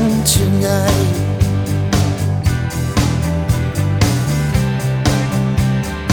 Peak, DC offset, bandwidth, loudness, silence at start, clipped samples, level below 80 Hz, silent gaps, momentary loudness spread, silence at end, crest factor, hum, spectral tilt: 0 dBFS; under 0.1%; over 20 kHz; -16 LUFS; 0 s; under 0.1%; -28 dBFS; none; 4 LU; 0 s; 14 dB; none; -5.5 dB/octave